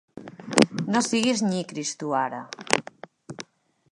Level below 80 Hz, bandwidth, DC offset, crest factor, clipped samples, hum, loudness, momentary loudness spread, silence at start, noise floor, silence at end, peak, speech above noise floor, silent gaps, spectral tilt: -68 dBFS; 11.5 kHz; under 0.1%; 26 dB; under 0.1%; none; -25 LUFS; 21 LU; 0.15 s; -58 dBFS; 0.5 s; 0 dBFS; 32 dB; none; -3.5 dB/octave